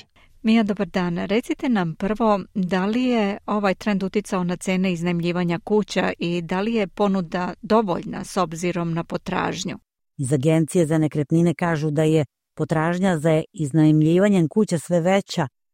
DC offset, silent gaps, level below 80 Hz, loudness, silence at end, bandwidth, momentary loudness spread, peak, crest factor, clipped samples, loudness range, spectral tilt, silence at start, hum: under 0.1%; none; -52 dBFS; -22 LUFS; 0.25 s; 15.5 kHz; 7 LU; -6 dBFS; 16 dB; under 0.1%; 4 LU; -6.5 dB/octave; 0.45 s; none